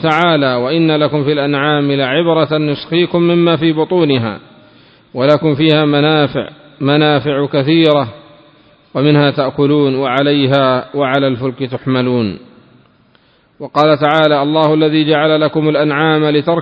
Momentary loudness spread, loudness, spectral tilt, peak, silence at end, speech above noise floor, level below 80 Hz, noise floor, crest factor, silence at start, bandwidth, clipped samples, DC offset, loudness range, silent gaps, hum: 7 LU; -13 LUFS; -8.5 dB/octave; 0 dBFS; 0 s; 39 dB; -52 dBFS; -51 dBFS; 12 dB; 0 s; 7 kHz; under 0.1%; under 0.1%; 3 LU; none; none